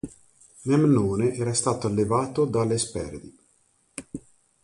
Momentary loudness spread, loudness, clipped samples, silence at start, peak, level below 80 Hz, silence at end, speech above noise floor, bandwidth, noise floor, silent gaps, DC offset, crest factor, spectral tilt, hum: 20 LU; -24 LUFS; under 0.1%; 0.05 s; -8 dBFS; -52 dBFS; 0.45 s; 42 dB; 11.5 kHz; -65 dBFS; none; under 0.1%; 16 dB; -6 dB/octave; none